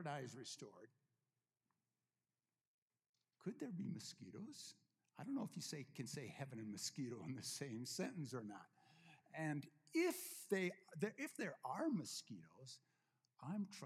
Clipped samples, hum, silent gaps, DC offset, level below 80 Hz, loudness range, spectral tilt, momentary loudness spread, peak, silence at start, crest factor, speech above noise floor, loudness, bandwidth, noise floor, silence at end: under 0.1%; none; 2.67-2.88 s, 3.09-3.13 s; under 0.1%; under -90 dBFS; 10 LU; -4.5 dB/octave; 16 LU; -28 dBFS; 0 s; 22 dB; over 42 dB; -48 LUFS; 16 kHz; under -90 dBFS; 0 s